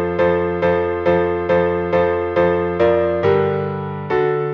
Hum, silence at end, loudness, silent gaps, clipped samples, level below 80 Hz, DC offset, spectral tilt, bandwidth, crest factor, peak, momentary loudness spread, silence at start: none; 0 s; -18 LUFS; none; under 0.1%; -44 dBFS; under 0.1%; -8.5 dB/octave; 6.2 kHz; 12 dB; -4 dBFS; 4 LU; 0 s